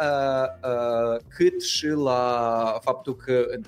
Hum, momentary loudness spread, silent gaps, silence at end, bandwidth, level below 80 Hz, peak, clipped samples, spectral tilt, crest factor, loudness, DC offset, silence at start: none; 4 LU; none; 0 s; 16 kHz; -58 dBFS; -8 dBFS; under 0.1%; -4.5 dB/octave; 14 dB; -24 LUFS; under 0.1%; 0 s